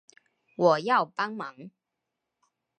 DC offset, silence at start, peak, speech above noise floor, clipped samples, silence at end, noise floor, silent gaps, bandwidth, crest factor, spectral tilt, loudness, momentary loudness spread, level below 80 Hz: under 0.1%; 0.6 s; -8 dBFS; 58 dB; under 0.1%; 1.1 s; -85 dBFS; none; 9 kHz; 22 dB; -5.5 dB/octave; -26 LUFS; 17 LU; -86 dBFS